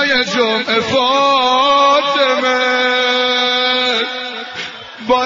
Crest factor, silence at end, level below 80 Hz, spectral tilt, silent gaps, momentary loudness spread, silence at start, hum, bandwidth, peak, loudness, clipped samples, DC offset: 12 dB; 0 s; -52 dBFS; -2.5 dB/octave; none; 12 LU; 0 s; none; 7.6 kHz; -2 dBFS; -13 LUFS; under 0.1%; under 0.1%